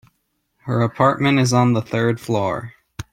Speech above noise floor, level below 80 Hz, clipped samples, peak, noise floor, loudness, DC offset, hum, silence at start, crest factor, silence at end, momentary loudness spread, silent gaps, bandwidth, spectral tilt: 52 dB; -54 dBFS; under 0.1%; -2 dBFS; -70 dBFS; -19 LUFS; under 0.1%; none; 0.65 s; 18 dB; 0.1 s; 18 LU; none; 14.5 kHz; -6 dB/octave